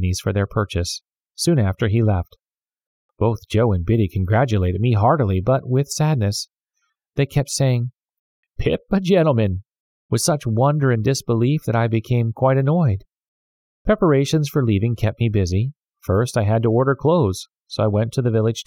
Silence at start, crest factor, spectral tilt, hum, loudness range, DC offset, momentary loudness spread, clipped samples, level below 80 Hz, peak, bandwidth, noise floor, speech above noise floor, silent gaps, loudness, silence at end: 0 s; 16 dB; -6.5 dB/octave; none; 3 LU; under 0.1%; 8 LU; under 0.1%; -42 dBFS; -4 dBFS; 16 kHz; -74 dBFS; 55 dB; 2.87-3.09 s, 8.19-8.43 s, 9.80-10.09 s, 13.28-13.85 s; -20 LUFS; 0.05 s